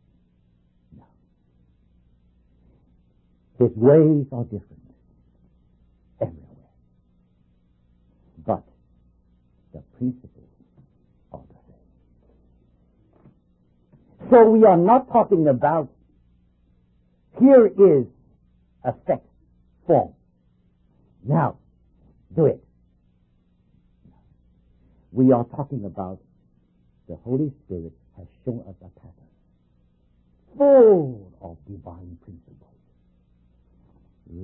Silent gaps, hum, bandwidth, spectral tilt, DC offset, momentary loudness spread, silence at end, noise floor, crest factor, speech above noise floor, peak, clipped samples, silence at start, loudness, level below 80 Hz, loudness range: none; 60 Hz at -55 dBFS; 3.5 kHz; -13.5 dB/octave; under 0.1%; 27 LU; 0 s; -62 dBFS; 20 dB; 44 dB; -2 dBFS; under 0.1%; 3.6 s; -19 LUFS; -56 dBFS; 20 LU